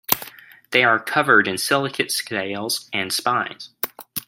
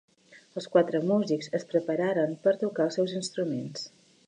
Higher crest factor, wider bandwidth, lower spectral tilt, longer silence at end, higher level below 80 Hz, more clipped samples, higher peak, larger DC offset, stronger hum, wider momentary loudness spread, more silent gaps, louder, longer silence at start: about the same, 22 dB vs 20 dB; first, 16.5 kHz vs 10.5 kHz; second, -2.5 dB/octave vs -6 dB/octave; second, 0.05 s vs 0.4 s; first, -66 dBFS vs -80 dBFS; neither; first, 0 dBFS vs -8 dBFS; neither; neither; about the same, 13 LU vs 13 LU; neither; first, -20 LUFS vs -28 LUFS; second, 0.1 s vs 0.3 s